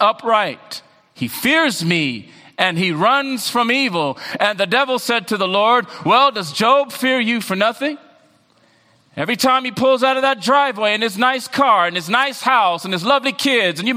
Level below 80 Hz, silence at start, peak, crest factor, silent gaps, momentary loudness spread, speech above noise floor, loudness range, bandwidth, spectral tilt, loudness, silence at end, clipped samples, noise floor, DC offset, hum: -66 dBFS; 0 s; 0 dBFS; 18 dB; none; 9 LU; 39 dB; 3 LU; 16 kHz; -3.5 dB/octave; -16 LUFS; 0 s; under 0.1%; -55 dBFS; under 0.1%; none